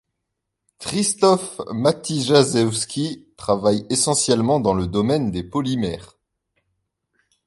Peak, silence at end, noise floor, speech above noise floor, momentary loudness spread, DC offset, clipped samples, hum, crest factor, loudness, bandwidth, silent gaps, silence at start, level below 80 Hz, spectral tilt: -2 dBFS; 1.4 s; -79 dBFS; 59 dB; 11 LU; under 0.1%; under 0.1%; none; 20 dB; -20 LUFS; 12 kHz; none; 0.8 s; -48 dBFS; -4.5 dB/octave